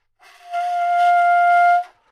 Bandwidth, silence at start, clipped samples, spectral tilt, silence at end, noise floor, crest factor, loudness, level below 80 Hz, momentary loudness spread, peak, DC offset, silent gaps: 10.5 kHz; 0.45 s; under 0.1%; 1 dB/octave; 0.25 s; -47 dBFS; 10 dB; -16 LUFS; -80 dBFS; 11 LU; -8 dBFS; under 0.1%; none